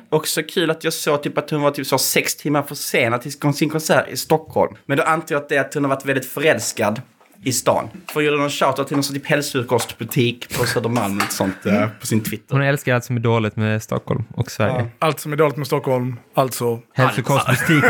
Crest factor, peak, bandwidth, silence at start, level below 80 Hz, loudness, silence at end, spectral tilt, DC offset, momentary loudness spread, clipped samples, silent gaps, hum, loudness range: 18 dB; -2 dBFS; 19 kHz; 0.1 s; -56 dBFS; -20 LUFS; 0 s; -4.5 dB/octave; under 0.1%; 5 LU; under 0.1%; none; none; 2 LU